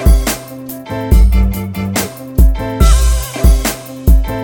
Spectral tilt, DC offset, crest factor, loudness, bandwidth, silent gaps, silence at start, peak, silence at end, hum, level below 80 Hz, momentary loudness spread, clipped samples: -5.5 dB/octave; under 0.1%; 10 dB; -14 LUFS; 17.5 kHz; none; 0 s; 0 dBFS; 0 s; none; -12 dBFS; 11 LU; under 0.1%